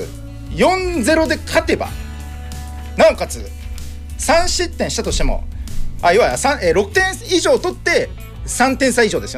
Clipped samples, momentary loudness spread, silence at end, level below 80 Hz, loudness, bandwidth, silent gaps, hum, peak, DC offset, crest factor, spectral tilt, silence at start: under 0.1%; 16 LU; 0 s; -26 dBFS; -16 LUFS; 16 kHz; none; none; -4 dBFS; under 0.1%; 12 dB; -4 dB/octave; 0 s